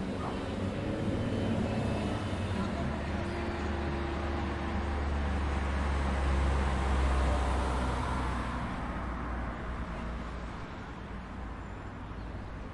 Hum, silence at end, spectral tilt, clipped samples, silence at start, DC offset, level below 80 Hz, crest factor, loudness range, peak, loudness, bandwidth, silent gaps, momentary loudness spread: none; 0 s; -6.5 dB/octave; under 0.1%; 0 s; under 0.1%; -36 dBFS; 16 dB; 8 LU; -18 dBFS; -34 LUFS; 11 kHz; none; 12 LU